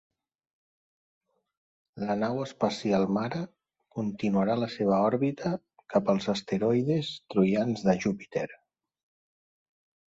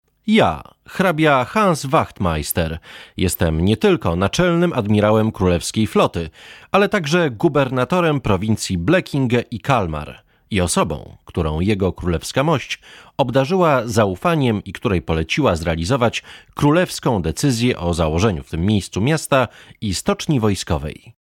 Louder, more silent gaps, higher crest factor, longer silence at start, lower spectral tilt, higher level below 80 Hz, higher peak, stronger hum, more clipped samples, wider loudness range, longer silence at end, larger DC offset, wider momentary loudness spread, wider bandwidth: second, -28 LUFS vs -18 LUFS; neither; about the same, 20 dB vs 16 dB; first, 1.95 s vs 0.25 s; first, -7 dB/octave vs -5.5 dB/octave; second, -66 dBFS vs -38 dBFS; second, -10 dBFS vs -2 dBFS; neither; neither; about the same, 4 LU vs 3 LU; first, 1.55 s vs 0.25 s; neither; about the same, 9 LU vs 9 LU; second, 8 kHz vs 17 kHz